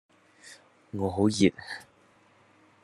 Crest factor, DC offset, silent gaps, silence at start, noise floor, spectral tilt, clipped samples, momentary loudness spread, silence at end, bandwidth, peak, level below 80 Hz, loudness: 22 dB; under 0.1%; none; 0.45 s; -61 dBFS; -5.5 dB/octave; under 0.1%; 26 LU; 1 s; 12 kHz; -8 dBFS; -68 dBFS; -27 LUFS